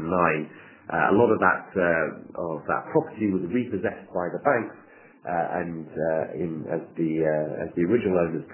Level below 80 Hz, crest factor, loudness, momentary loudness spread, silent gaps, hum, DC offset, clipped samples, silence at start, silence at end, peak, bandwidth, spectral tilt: -56 dBFS; 22 dB; -25 LUFS; 10 LU; none; none; under 0.1%; under 0.1%; 0 s; 0 s; -4 dBFS; 3.2 kHz; -11 dB/octave